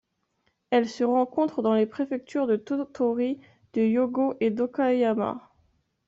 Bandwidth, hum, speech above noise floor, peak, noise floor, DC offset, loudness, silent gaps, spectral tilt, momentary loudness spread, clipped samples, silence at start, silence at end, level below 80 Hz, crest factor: 7.6 kHz; none; 48 dB; -10 dBFS; -73 dBFS; under 0.1%; -26 LUFS; none; -5.5 dB/octave; 7 LU; under 0.1%; 0.7 s; 0.7 s; -70 dBFS; 16 dB